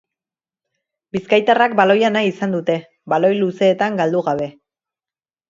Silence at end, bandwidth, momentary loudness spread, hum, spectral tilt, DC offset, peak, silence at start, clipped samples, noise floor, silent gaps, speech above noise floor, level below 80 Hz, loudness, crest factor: 1 s; 7.6 kHz; 11 LU; none; -6 dB/octave; under 0.1%; 0 dBFS; 1.15 s; under 0.1%; under -90 dBFS; none; over 74 dB; -64 dBFS; -17 LUFS; 18 dB